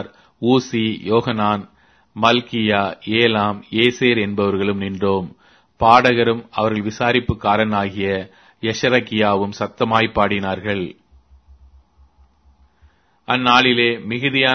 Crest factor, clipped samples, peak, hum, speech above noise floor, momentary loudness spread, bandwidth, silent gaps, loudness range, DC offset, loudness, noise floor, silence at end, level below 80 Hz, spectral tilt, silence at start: 18 dB; under 0.1%; 0 dBFS; none; 37 dB; 11 LU; 6.6 kHz; none; 5 LU; under 0.1%; -18 LUFS; -55 dBFS; 0 s; -48 dBFS; -5.5 dB/octave; 0 s